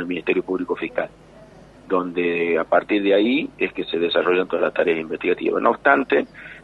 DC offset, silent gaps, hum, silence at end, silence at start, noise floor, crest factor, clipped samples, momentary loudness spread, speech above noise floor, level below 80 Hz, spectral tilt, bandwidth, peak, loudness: under 0.1%; none; none; 0 s; 0 s; -45 dBFS; 20 dB; under 0.1%; 8 LU; 25 dB; -58 dBFS; -7 dB/octave; 5.8 kHz; -2 dBFS; -21 LUFS